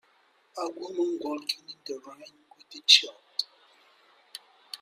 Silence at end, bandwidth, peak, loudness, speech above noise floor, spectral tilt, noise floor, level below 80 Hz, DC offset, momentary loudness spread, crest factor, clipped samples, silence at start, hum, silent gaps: 0.05 s; 15.5 kHz; -4 dBFS; -25 LUFS; 37 dB; 0.5 dB/octave; -65 dBFS; -88 dBFS; under 0.1%; 27 LU; 28 dB; under 0.1%; 0.55 s; none; none